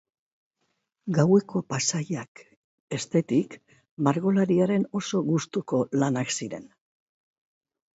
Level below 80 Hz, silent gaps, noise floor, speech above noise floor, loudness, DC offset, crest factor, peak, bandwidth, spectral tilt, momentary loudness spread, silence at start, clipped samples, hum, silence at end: -68 dBFS; 2.28-2.35 s, 2.56-2.88 s, 3.91-3.97 s; -77 dBFS; 52 dB; -26 LUFS; under 0.1%; 20 dB; -8 dBFS; 8.2 kHz; -5.5 dB/octave; 13 LU; 1.05 s; under 0.1%; none; 1.3 s